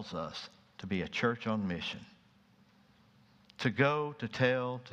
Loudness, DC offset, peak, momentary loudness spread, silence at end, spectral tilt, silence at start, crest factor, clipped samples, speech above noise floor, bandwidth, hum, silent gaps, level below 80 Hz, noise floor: -34 LUFS; under 0.1%; -12 dBFS; 15 LU; 0 s; -6 dB/octave; 0 s; 24 dB; under 0.1%; 31 dB; 9.4 kHz; none; none; -68 dBFS; -65 dBFS